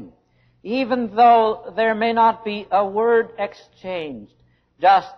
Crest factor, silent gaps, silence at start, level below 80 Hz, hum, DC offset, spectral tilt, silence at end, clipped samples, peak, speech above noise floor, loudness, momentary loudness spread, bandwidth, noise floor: 14 dB; none; 0 s; -60 dBFS; none; under 0.1%; -6.5 dB/octave; 0.05 s; under 0.1%; -4 dBFS; 41 dB; -19 LUFS; 16 LU; 6.2 kHz; -60 dBFS